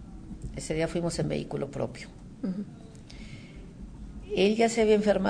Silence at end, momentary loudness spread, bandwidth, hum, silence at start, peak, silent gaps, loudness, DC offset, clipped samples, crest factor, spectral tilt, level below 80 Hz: 0 s; 22 LU; 10 kHz; none; 0 s; -12 dBFS; none; -28 LUFS; under 0.1%; under 0.1%; 18 dB; -5.5 dB/octave; -48 dBFS